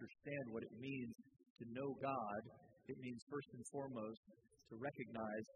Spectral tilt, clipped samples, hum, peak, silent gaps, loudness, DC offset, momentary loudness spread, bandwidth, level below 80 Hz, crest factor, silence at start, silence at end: -6 dB/octave; under 0.1%; none; -32 dBFS; 1.50-1.56 s, 3.22-3.27 s, 4.17-4.23 s; -49 LUFS; under 0.1%; 14 LU; 9.4 kHz; -84 dBFS; 18 dB; 0 s; 0.05 s